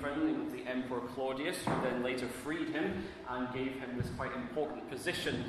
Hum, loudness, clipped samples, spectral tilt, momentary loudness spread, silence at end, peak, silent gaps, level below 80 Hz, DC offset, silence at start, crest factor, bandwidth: none; -37 LUFS; under 0.1%; -5.5 dB/octave; 5 LU; 0 s; -22 dBFS; none; -58 dBFS; under 0.1%; 0 s; 16 dB; 14 kHz